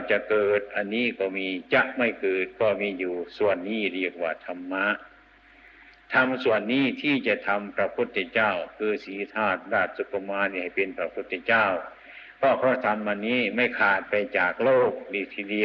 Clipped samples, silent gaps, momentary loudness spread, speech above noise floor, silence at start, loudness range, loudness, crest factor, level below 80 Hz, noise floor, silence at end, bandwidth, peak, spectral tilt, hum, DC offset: under 0.1%; none; 9 LU; 29 dB; 0 s; 4 LU; -25 LUFS; 18 dB; -66 dBFS; -54 dBFS; 0 s; 6.2 kHz; -8 dBFS; -7 dB/octave; none; under 0.1%